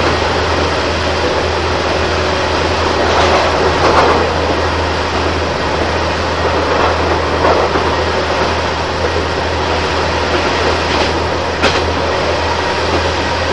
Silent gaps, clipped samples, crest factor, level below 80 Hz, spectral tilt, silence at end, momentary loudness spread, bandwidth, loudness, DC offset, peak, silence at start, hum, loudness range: none; under 0.1%; 14 dB; -28 dBFS; -4.5 dB/octave; 0 s; 4 LU; 10.5 kHz; -14 LUFS; 2%; 0 dBFS; 0 s; none; 2 LU